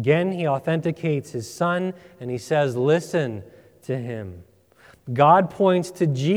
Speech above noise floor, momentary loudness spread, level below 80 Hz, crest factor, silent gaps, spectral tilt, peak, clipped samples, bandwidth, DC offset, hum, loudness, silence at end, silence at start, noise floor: 32 dB; 17 LU; -64 dBFS; 20 dB; none; -7 dB/octave; -2 dBFS; under 0.1%; 15.5 kHz; under 0.1%; none; -22 LUFS; 0 s; 0 s; -53 dBFS